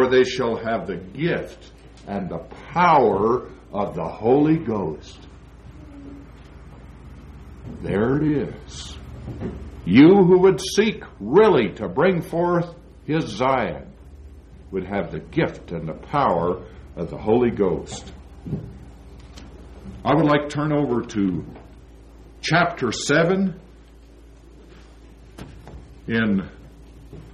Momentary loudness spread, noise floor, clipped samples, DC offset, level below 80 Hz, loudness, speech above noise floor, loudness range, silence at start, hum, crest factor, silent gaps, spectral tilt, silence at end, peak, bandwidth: 24 LU; -46 dBFS; under 0.1%; under 0.1%; -44 dBFS; -21 LUFS; 26 dB; 10 LU; 0 s; none; 20 dB; none; -6.5 dB/octave; 0 s; -2 dBFS; 12.5 kHz